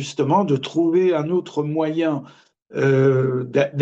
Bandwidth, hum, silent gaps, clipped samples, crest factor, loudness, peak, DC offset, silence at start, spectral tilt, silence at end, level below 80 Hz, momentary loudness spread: 8.2 kHz; none; none; under 0.1%; 14 dB; -20 LUFS; -6 dBFS; under 0.1%; 0 s; -7 dB/octave; 0 s; -66 dBFS; 7 LU